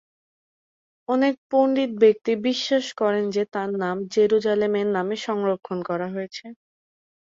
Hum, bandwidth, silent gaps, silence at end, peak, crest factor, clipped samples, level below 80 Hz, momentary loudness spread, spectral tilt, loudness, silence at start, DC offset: none; 7.6 kHz; 1.38-1.50 s; 0.75 s; -6 dBFS; 18 dB; under 0.1%; -68 dBFS; 10 LU; -5.5 dB/octave; -23 LUFS; 1.1 s; under 0.1%